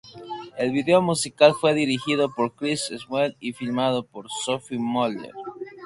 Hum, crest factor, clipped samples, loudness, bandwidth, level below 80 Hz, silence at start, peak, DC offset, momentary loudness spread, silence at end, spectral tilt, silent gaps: none; 22 dB; under 0.1%; -23 LUFS; 11.5 kHz; -64 dBFS; 0.05 s; -2 dBFS; under 0.1%; 17 LU; 0 s; -4.5 dB/octave; none